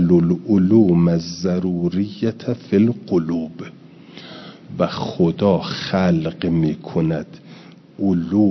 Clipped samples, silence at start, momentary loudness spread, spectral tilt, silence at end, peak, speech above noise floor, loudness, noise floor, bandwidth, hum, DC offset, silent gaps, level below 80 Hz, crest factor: under 0.1%; 0 s; 20 LU; -8 dB/octave; 0 s; -2 dBFS; 24 dB; -19 LUFS; -42 dBFS; 6.2 kHz; none; under 0.1%; none; -54 dBFS; 16 dB